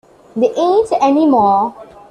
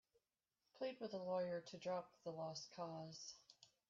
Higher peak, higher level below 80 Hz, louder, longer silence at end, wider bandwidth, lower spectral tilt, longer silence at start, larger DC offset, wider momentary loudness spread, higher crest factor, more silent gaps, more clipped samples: first, -2 dBFS vs -34 dBFS; first, -54 dBFS vs under -90 dBFS; first, -13 LUFS vs -49 LUFS; about the same, 0.25 s vs 0.25 s; first, 10 kHz vs 7.4 kHz; first, -6.5 dB/octave vs -4.5 dB/octave; second, 0.35 s vs 0.75 s; neither; second, 8 LU vs 11 LU; about the same, 12 dB vs 16 dB; neither; neither